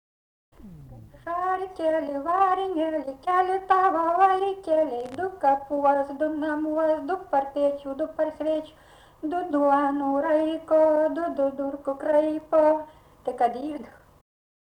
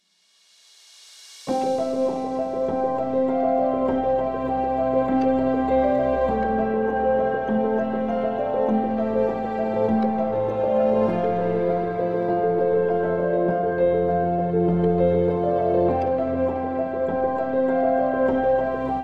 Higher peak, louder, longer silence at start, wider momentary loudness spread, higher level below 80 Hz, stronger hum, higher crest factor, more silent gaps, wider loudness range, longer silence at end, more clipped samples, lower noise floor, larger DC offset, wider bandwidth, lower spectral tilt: about the same, -8 dBFS vs -8 dBFS; second, -25 LUFS vs -22 LUFS; second, 0.6 s vs 0.8 s; first, 10 LU vs 4 LU; second, -60 dBFS vs -46 dBFS; neither; about the same, 16 dB vs 14 dB; neither; about the same, 4 LU vs 2 LU; first, 0.75 s vs 0 s; neither; second, -46 dBFS vs -62 dBFS; second, under 0.1% vs 0.4%; about the same, 9.8 kHz vs 9.2 kHz; second, -6 dB/octave vs -8.5 dB/octave